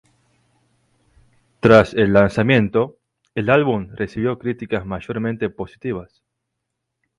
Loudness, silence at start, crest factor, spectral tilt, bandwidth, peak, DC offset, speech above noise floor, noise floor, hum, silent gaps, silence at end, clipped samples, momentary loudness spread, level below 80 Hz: -19 LUFS; 1.65 s; 20 dB; -7.5 dB/octave; 11 kHz; 0 dBFS; under 0.1%; 60 dB; -78 dBFS; none; none; 1.15 s; under 0.1%; 15 LU; -46 dBFS